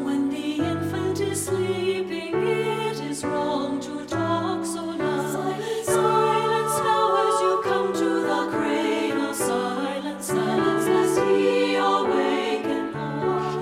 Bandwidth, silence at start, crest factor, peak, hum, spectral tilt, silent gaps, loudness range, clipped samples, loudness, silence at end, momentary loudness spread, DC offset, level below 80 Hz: 16 kHz; 0 s; 14 dB; -8 dBFS; none; -4.5 dB/octave; none; 4 LU; under 0.1%; -24 LUFS; 0 s; 7 LU; under 0.1%; -60 dBFS